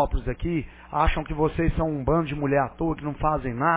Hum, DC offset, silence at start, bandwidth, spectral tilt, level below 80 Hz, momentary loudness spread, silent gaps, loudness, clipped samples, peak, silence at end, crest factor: none; under 0.1%; 0 s; 4 kHz; -11 dB/octave; -32 dBFS; 5 LU; none; -26 LUFS; under 0.1%; -8 dBFS; 0 s; 16 dB